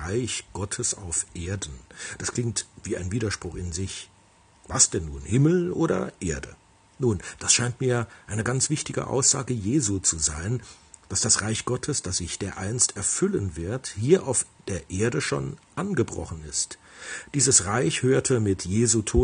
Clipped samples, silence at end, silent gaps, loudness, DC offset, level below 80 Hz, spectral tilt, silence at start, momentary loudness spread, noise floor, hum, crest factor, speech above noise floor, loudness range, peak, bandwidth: under 0.1%; 0 s; none; -25 LUFS; under 0.1%; -48 dBFS; -4 dB/octave; 0 s; 12 LU; -57 dBFS; none; 22 dB; 32 dB; 6 LU; -4 dBFS; 10 kHz